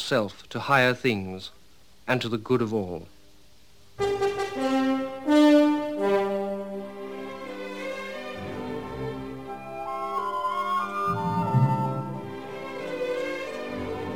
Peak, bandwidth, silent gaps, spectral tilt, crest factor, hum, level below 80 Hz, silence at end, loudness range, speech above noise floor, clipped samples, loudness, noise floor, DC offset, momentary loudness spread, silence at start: -8 dBFS; 18 kHz; none; -6.5 dB/octave; 18 dB; none; -58 dBFS; 0 s; 9 LU; 32 dB; under 0.1%; -27 LUFS; -58 dBFS; 0.3%; 15 LU; 0 s